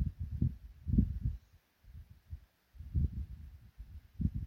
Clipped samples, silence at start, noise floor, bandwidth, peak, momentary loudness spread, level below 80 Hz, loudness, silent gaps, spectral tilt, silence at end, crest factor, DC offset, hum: under 0.1%; 0 s; -65 dBFS; 4 kHz; -16 dBFS; 23 LU; -42 dBFS; -38 LUFS; none; -11 dB/octave; 0 s; 22 dB; under 0.1%; none